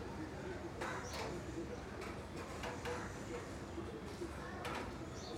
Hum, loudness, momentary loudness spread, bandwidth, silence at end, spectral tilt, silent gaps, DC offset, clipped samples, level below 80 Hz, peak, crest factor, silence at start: none; -46 LUFS; 3 LU; 16 kHz; 0 s; -5 dB/octave; none; under 0.1%; under 0.1%; -56 dBFS; -30 dBFS; 16 dB; 0 s